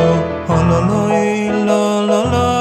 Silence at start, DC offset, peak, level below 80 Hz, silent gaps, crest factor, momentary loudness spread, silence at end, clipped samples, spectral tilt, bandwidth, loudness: 0 s; under 0.1%; -2 dBFS; -34 dBFS; none; 12 dB; 2 LU; 0 s; under 0.1%; -6.5 dB/octave; 13 kHz; -15 LUFS